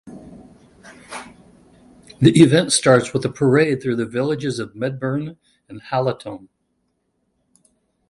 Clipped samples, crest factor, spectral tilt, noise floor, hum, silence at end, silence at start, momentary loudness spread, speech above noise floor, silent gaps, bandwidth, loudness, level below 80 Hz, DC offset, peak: under 0.1%; 20 dB; -5.5 dB/octave; -70 dBFS; none; 1.7 s; 0.05 s; 22 LU; 52 dB; none; 11.5 kHz; -18 LUFS; -56 dBFS; under 0.1%; 0 dBFS